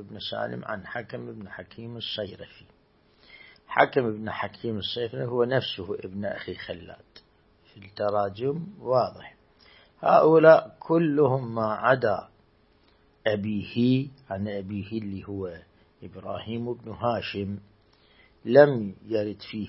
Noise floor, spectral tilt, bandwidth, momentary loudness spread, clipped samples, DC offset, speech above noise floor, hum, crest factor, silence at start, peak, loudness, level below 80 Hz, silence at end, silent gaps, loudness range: -62 dBFS; -10.5 dB/octave; 5.8 kHz; 19 LU; under 0.1%; under 0.1%; 36 dB; none; 24 dB; 0 s; -2 dBFS; -26 LUFS; -64 dBFS; 0 s; none; 12 LU